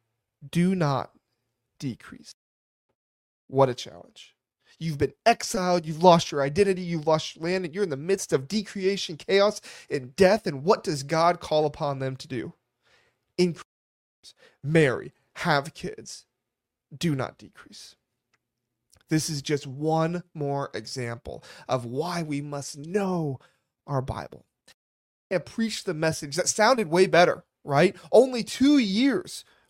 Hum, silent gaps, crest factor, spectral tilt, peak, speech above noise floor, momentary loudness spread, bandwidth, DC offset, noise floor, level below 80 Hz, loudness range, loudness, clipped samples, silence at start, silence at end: none; 2.34-2.89 s, 2.95-3.48 s, 13.65-14.23 s, 24.74-25.30 s; 24 dB; -5 dB/octave; -2 dBFS; 60 dB; 16 LU; 16 kHz; under 0.1%; -85 dBFS; -58 dBFS; 9 LU; -25 LUFS; under 0.1%; 0.4 s; 0.3 s